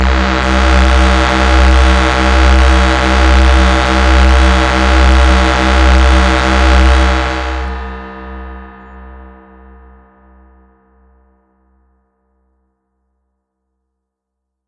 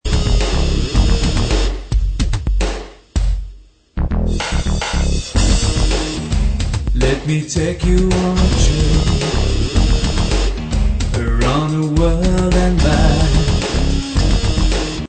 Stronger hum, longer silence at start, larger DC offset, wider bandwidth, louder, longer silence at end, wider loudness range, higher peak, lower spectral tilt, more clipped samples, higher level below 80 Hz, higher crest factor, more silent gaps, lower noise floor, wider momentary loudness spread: neither; about the same, 0 s vs 0.05 s; neither; first, 10 kHz vs 9 kHz; first, -10 LUFS vs -17 LUFS; first, 5.45 s vs 0.05 s; first, 11 LU vs 5 LU; about the same, 0 dBFS vs 0 dBFS; about the same, -5.5 dB/octave vs -5.5 dB/octave; neither; about the same, -12 dBFS vs -16 dBFS; about the same, 10 dB vs 14 dB; neither; first, -76 dBFS vs -39 dBFS; first, 14 LU vs 6 LU